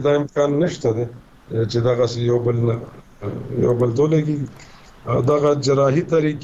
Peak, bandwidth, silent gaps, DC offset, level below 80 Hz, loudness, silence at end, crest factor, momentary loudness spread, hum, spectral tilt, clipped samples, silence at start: -6 dBFS; 8 kHz; none; under 0.1%; -48 dBFS; -19 LUFS; 0 s; 12 dB; 13 LU; none; -7.5 dB/octave; under 0.1%; 0 s